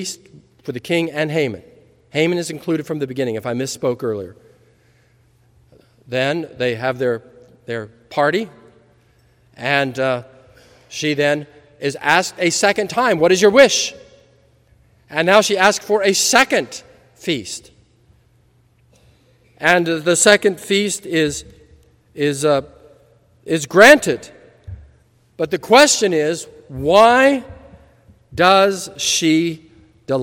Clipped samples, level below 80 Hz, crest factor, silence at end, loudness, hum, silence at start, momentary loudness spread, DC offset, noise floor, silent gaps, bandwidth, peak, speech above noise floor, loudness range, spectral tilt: 0.1%; -54 dBFS; 18 dB; 0 s; -16 LUFS; none; 0 s; 17 LU; under 0.1%; -56 dBFS; none; 16.5 kHz; 0 dBFS; 40 dB; 9 LU; -3 dB/octave